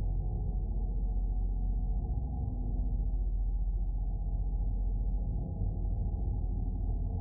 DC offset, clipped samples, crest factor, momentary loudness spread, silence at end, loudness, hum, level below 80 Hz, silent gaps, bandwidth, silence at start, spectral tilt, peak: under 0.1%; under 0.1%; 10 dB; 1 LU; 0 s; -36 LUFS; none; -32 dBFS; none; 1 kHz; 0 s; -17.5 dB/octave; -22 dBFS